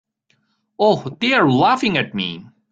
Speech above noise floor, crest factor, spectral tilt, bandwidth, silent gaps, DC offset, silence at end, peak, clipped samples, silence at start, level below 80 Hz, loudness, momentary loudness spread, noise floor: 48 dB; 16 dB; -6 dB/octave; 9 kHz; none; under 0.1%; 0.3 s; -2 dBFS; under 0.1%; 0.8 s; -58 dBFS; -17 LUFS; 11 LU; -65 dBFS